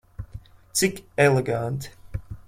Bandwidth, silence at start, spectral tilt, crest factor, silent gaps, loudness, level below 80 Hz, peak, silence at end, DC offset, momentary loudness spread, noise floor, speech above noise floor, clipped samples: 16.5 kHz; 0.2 s; -4.5 dB/octave; 20 dB; none; -23 LUFS; -46 dBFS; -4 dBFS; 0.05 s; under 0.1%; 21 LU; -43 dBFS; 21 dB; under 0.1%